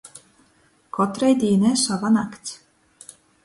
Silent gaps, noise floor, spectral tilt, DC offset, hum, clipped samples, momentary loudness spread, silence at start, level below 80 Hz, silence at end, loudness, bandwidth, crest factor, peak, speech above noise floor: none; -60 dBFS; -5 dB/octave; under 0.1%; none; under 0.1%; 17 LU; 0.05 s; -62 dBFS; 0.9 s; -20 LUFS; 11.5 kHz; 16 dB; -6 dBFS; 40 dB